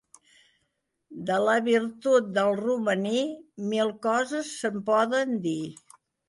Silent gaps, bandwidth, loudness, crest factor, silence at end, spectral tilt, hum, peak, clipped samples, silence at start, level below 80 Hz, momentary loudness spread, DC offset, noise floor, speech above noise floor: none; 11.5 kHz; -26 LUFS; 16 dB; 0.55 s; -5 dB/octave; none; -10 dBFS; under 0.1%; 1.1 s; -74 dBFS; 10 LU; under 0.1%; -77 dBFS; 52 dB